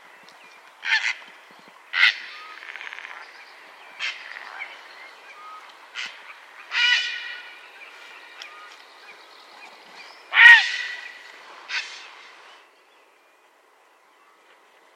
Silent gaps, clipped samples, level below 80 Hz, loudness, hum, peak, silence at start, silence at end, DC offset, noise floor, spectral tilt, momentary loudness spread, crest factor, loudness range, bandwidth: none; under 0.1%; -86 dBFS; -18 LUFS; none; 0 dBFS; 0.85 s; 2.9 s; under 0.1%; -58 dBFS; 3.5 dB/octave; 25 LU; 26 dB; 19 LU; 15 kHz